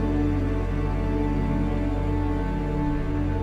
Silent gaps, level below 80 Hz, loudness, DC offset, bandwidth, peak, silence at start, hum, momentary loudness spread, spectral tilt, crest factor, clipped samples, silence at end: none; -28 dBFS; -26 LUFS; under 0.1%; 7.4 kHz; -12 dBFS; 0 s; none; 2 LU; -9 dB/octave; 10 dB; under 0.1%; 0 s